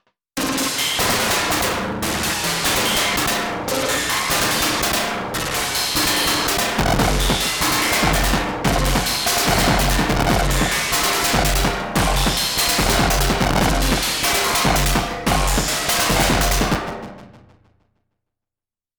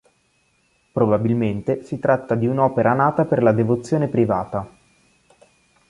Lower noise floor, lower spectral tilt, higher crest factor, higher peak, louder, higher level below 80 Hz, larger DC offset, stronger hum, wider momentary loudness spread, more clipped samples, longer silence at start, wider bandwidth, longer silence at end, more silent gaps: first, -89 dBFS vs -64 dBFS; second, -3 dB/octave vs -9 dB/octave; second, 12 dB vs 18 dB; second, -8 dBFS vs -2 dBFS; about the same, -18 LUFS vs -20 LUFS; first, -28 dBFS vs -54 dBFS; neither; neither; second, 5 LU vs 8 LU; neither; second, 0.35 s vs 0.95 s; first, over 20 kHz vs 11 kHz; first, 1.6 s vs 1.2 s; neither